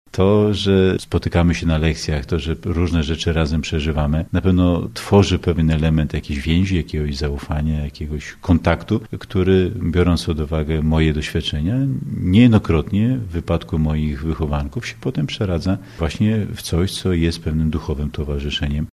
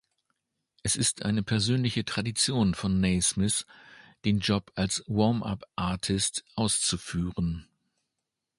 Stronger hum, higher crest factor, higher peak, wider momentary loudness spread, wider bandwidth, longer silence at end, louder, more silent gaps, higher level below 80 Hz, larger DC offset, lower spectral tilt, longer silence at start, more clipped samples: neither; about the same, 18 dB vs 18 dB; first, 0 dBFS vs -10 dBFS; about the same, 8 LU vs 7 LU; first, 13 kHz vs 11.5 kHz; second, 0.1 s vs 0.95 s; first, -19 LUFS vs -28 LUFS; neither; first, -28 dBFS vs -48 dBFS; neither; first, -7 dB/octave vs -4 dB/octave; second, 0.15 s vs 0.85 s; neither